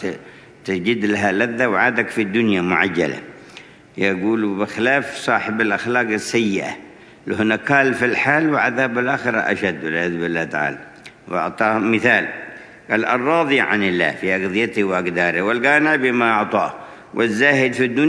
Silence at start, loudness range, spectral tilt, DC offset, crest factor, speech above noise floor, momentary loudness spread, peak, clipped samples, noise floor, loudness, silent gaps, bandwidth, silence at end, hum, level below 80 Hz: 0 s; 3 LU; -5.5 dB/octave; under 0.1%; 18 dB; 24 dB; 11 LU; 0 dBFS; under 0.1%; -42 dBFS; -18 LUFS; none; 11 kHz; 0 s; none; -62 dBFS